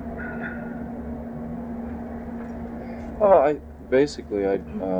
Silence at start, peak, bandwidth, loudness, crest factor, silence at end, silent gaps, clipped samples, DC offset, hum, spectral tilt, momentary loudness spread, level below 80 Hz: 0 s; -6 dBFS; 9.8 kHz; -26 LUFS; 20 dB; 0 s; none; under 0.1%; under 0.1%; none; -7 dB/octave; 16 LU; -44 dBFS